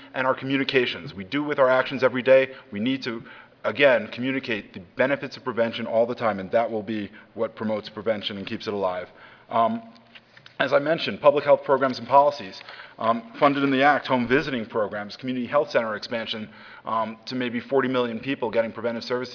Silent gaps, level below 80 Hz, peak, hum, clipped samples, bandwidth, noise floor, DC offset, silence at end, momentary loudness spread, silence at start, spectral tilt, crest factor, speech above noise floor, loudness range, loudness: none; -64 dBFS; -2 dBFS; none; under 0.1%; 5.4 kHz; -50 dBFS; under 0.1%; 0 s; 12 LU; 0 s; -6 dB/octave; 22 dB; 26 dB; 6 LU; -24 LUFS